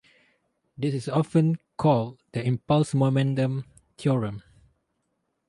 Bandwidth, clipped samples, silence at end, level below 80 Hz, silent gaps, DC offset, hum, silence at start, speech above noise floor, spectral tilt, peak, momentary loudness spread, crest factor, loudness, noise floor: 11.5 kHz; under 0.1%; 1.1 s; -60 dBFS; none; under 0.1%; none; 0.8 s; 52 dB; -8 dB/octave; -8 dBFS; 9 LU; 18 dB; -25 LUFS; -76 dBFS